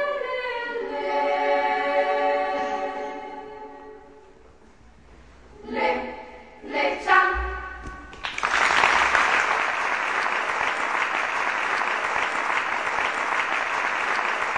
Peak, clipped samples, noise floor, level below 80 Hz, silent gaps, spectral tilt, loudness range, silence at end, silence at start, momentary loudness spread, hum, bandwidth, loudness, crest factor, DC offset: -4 dBFS; under 0.1%; -52 dBFS; -48 dBFS; none; -2.5 dB/octave; 12 LU; 0 s; 0 s; 17 LU; none; 10 kHz; -23 LUFS; 20 dB; 0.2%